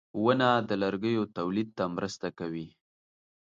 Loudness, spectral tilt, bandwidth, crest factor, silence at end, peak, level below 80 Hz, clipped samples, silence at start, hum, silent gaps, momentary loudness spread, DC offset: -30 LUFS; -6 dB/octave; 7.8 kHz; 20 dB; 0.75 s; -10 dBFS; -66 dBFS; under 0.1%; 0.15 s; none; none; 12 LU; under 0.1%